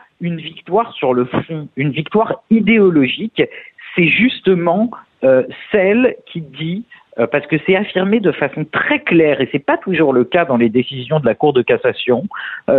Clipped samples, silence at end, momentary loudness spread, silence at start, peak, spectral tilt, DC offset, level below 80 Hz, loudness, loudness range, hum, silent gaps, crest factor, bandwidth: under 0.1%; 0 s; 11 LU; 0.2 s; -2 dBFS; -9.5 dB/octave; under 0.1%; -54 dBFS; -15 LUFS; 2 LU; none; none; 12 dB; 4.3 kHz